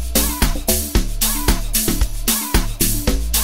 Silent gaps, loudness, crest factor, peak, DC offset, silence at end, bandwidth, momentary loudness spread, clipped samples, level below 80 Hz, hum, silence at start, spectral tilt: none; -18 LUFS; 16 dB; -2 dBFS; 3%; 0 s; 16.5 kHz; 3 LU; under 0.1%; -22 dBFS; none; 0 s; -3 dB/octave